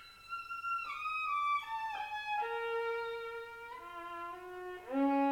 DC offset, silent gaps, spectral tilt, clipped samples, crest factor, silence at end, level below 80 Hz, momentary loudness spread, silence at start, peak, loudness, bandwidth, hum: under 0.1%; none; -4 dB/octave; under 0.1%; 14 dB; 0 s; -74 dBFS; 13 LU; 0 s; -22 dBFS; -38 LUFS; 16.5 kHz; none